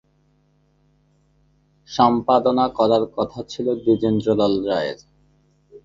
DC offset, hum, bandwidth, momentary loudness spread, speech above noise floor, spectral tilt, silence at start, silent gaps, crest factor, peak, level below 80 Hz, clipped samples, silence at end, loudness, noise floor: under 0.1%; none; 7.6 kHz; 9 LU; 42 dB; -7 dB/octave; 1.9 s; none; 20 dB; -2 dBFS; -54 dBFS; under 0.1%; 0.05 s; -20 LUFS; -61 dBFS